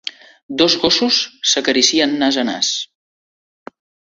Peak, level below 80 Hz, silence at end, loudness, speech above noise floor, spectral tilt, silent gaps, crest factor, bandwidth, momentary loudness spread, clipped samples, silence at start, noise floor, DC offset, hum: 0 dBFS; -56 dBFS; 1.3 s; -15 LUFS; over 74 dB; -1.5 dB/octave; 0.43-0.49 s; 18 dB; 7.8 kHz; 12 LU; under 0.1%; 0.05 s; under -90 dBFS; under 0.1%; none